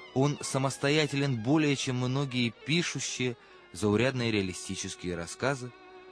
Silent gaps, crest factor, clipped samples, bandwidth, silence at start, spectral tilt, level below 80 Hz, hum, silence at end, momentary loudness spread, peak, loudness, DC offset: none; 18 dB; under 0.1%; 11 kHz; 0 s; -5 dB/octave; -62 dBFS; none; 0 s; 9 LU; -12 dBFS; -30 LUFS; under 0.1%